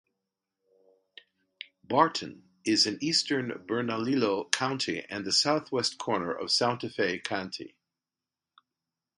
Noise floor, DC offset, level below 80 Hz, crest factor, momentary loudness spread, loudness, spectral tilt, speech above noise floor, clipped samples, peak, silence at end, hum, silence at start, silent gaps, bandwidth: under -90 dBFS; under 0.1%; -72 dBFS; 30 dB; 14 LU; -28 LUFS; -3 dB/octave; over 61 dB; under 0.1%; 0 dBFS; 1.5 s; none; 1.6 s; none; 11.5 kHz